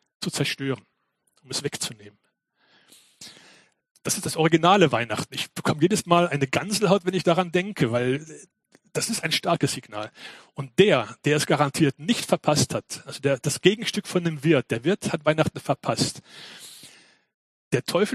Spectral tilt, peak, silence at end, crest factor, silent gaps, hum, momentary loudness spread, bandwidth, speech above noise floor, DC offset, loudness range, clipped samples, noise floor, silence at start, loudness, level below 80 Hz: -4.5 dB/octave; 0 dBFS; 0 s; 24 dB; 3.91-3.95 s, 17.34-17.71 s; none; 16 LU; 14.5 kHz; 46 dB; under 0.1%; 8 LU; under 0.1%; -69 dBFS; 0.2 s; -23 LUFS; -60 dBFS